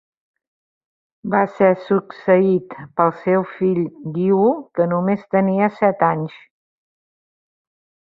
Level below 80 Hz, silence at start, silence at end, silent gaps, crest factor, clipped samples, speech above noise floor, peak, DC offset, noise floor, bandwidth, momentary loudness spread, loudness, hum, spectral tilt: -64 dBFS; 1.25 s; 1.85 s; none; 18 dB; under 0.1%; over 72 dB; -2 dBFS; under 0.1%; under -90 dBFS; 5.2 kHz; 7 LU; -18 LUFS; none; -10.5 dB/octave